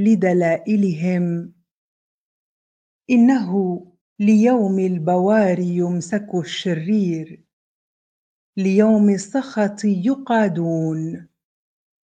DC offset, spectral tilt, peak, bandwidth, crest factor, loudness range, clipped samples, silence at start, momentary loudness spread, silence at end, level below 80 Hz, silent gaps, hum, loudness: under 0.1%; -7 dB/octave; -2 dBFS; 9.2 kHz; 18 dB; 4 LU; under 0.1%; 0 s; 11 LU; 0.8 s; -68 dBFS; 1.71-3.01 s, 4.01-4.16 s, 7.53-8.53 s; none; -19 LUFS